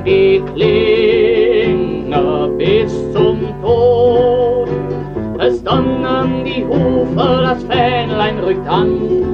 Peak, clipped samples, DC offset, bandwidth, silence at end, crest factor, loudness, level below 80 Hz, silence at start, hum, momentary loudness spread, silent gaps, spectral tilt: -2 dBFS; under 0.1%; under 0.1%; 6.8 kHz; 0 s; 10 dB; -14 LUFS; -34 dBFS; 0 s; none; 6 LU; none; -8 dB/octave